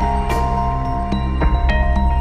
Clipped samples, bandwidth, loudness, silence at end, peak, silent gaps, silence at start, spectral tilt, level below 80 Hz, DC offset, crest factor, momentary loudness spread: under 0.1%; 9.4 kHz; -19 LUFS; 0 s; -4 dBFS; none; 0 s; -7.5 dB/octave; -18 dBFS; under 0.1%; 12 dB; 4 LU